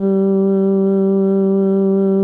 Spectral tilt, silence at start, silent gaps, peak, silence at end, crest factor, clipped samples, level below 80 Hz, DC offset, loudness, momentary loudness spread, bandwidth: -13 dB/octave; 0 s; none; -8 dBFS; 0 s; 6 dB; under 0.1%; -68 dBFS; under 0.1%; -15 LUFS; 0 LU; 1.8 kHz